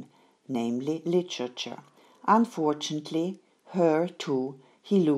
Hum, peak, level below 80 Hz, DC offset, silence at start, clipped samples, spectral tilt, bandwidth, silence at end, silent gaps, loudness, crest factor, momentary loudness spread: none; -8 dBFS; -84 dBFS; under 0.1%; 0 s; under 0.1%; -6 dB/octave; 12.5 kHz; 0 s; none; -28 LUFS; 20 dB; 13 LU